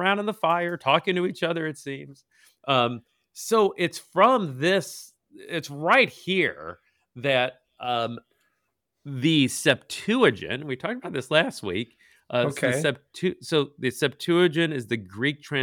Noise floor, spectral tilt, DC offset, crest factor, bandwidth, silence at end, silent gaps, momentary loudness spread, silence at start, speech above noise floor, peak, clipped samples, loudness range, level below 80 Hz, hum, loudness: -78 dBFS; -4.5 dB/octave; under 0.1%; 20 dB; 19 kHz; 0 s; none; 13 LU; 0 s; 54 dB; -6 dBFS; under 0.1%; 3 LU; -70 dBFS; none; -24 LUFS